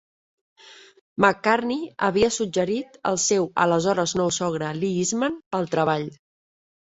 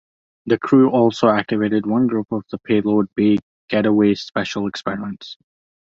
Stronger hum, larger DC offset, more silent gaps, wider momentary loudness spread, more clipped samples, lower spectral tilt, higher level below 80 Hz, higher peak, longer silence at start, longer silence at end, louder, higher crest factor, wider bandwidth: neither; neither; about the same, 1.01-1.16 s, 5.46-5.51 s vs 3.43-3.68 s; second, 6 LU vs 12 LU; neither; second, -4 dB/octave vs -7 dB/octave; about the same, -58 dBFS vs -56 dBFS; about the same, -2 dBFS vs -2 dBFS; first, 0.65 s vs 0.45 s; about the same, 0.7 s vs 0.65 s; second, -23 LUFS vs -18 LUFS; first, 22 dB vs 16 dB; about the same, 8.2 kHz vs 7.6 kHz